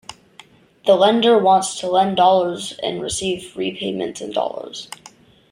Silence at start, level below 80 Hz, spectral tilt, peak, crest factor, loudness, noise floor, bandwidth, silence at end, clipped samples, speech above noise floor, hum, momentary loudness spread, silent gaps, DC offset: 0.1 s; -56 dBFS; -4 dB/octave; -2 dBFS; 18 dB; -18 LUFS; -48 dBFS; 15.5 kHz; 0.65 s; under 0.1%; 30 dB; none; 18 LU; none; under 0.1%